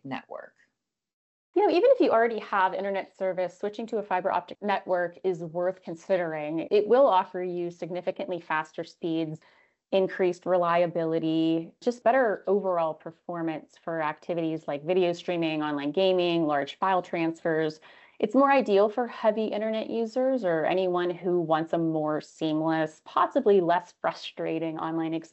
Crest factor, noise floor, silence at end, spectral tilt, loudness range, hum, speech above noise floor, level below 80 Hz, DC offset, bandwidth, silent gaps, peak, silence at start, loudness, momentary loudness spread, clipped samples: 16 dB; -79 dBFS; 0.05 s; -6.5 dB/octave; 4 LU; none; 52 dB; -78 dBFS; under 0.1%; 8.2 kHz; 1.13-1.53 s; -10 dBFS; 0.05 s; -27 LUFS; 11 LU; under 0.1%